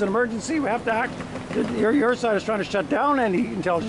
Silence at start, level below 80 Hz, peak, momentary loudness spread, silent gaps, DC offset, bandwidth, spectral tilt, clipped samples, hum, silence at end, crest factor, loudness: 0 s; -52 dBFS; -10 dBFS; 6 LU; none; under 0.1%; 11.5 kHz; -5.5 dB/octave; under 0.1%; none; 0 s; 12 dB; -23 LUFS